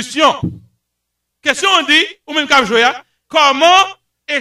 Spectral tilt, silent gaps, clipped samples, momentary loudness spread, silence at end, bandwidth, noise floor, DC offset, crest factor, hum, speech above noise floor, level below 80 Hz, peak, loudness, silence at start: -2.5 dB/octave; none; under 0.1%; 12 LU; 0 s; 15.5 kHz; -74 dBFS; under 0.1%; 14 dB; none; 62 dB; -52 dBFS; 0 dBFS; -12 LUFS; 0 s